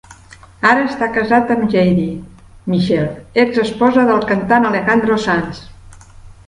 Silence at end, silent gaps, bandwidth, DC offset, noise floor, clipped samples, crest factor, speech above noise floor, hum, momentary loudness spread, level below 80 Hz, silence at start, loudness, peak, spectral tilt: 0.15 s; none; 11 kHz; under 0.1%; -40 dBFS; under 0.1%; 16 dB; 26 dB; none; 7 LU; -44 dBFS; 0.1 s; -15 LUFS; 0 dBFS; -7 dB/octave